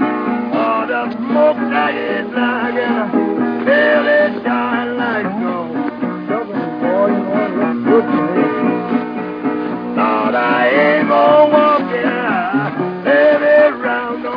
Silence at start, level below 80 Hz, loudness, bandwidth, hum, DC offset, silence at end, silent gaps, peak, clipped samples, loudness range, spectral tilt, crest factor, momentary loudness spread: 0 s; -58 dBFS; -15 LUFS; 5.2 kHz; none; under 0.1%; 0 s; none; 0 dBFS; under 0.1%; 4 LU; -8.5 dB/octave; 14 dB; 9 LU